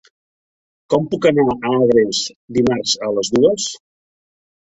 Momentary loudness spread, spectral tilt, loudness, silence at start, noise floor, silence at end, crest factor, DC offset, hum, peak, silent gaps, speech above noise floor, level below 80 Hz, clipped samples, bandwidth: 8 LU; -4.5 dB/octave; -17 LUFS; 0.9 s; under -90 dBFS; 0.95 s; 16 dB; under 0.1%; none; -2 dBFS; 2.36-2.48 s; over 74 dB; -52 dBFS; under 0.1%; 8.4 kHz